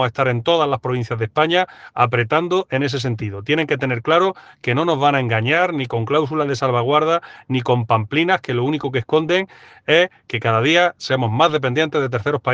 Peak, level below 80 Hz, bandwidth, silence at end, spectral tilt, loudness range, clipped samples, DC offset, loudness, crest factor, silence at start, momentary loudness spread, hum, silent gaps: 0 dBFS; -60 dBFS; 7.8 kHz; 0 s; -6 dB/octave; 1 LU; under 0.1%; under 0.1%; -18 LUFS; 18 dB; 0 s; 6 LU; none; none